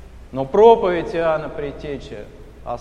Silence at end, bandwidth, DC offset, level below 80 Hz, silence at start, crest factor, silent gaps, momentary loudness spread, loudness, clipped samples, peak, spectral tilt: 0 s; 7 kHz; under 0.1%; -42 dBFS; 0 s; 18 dB; none; 22 LU; -17 LUFS; under 0.1%; 0 dBFS; -7 dB/octave